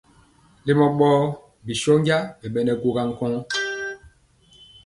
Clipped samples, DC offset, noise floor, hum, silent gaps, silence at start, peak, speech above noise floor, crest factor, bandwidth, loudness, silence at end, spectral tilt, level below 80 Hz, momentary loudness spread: under 0.1%; under 0.1%; -56 dBFS; none; none; 0.65 s; -4 dBFS; 35 dB; 18 dB; 11.5 kHz; -22 LUFS; 0.8 s; -6 dB/octave; -56 dBFS; 13 LU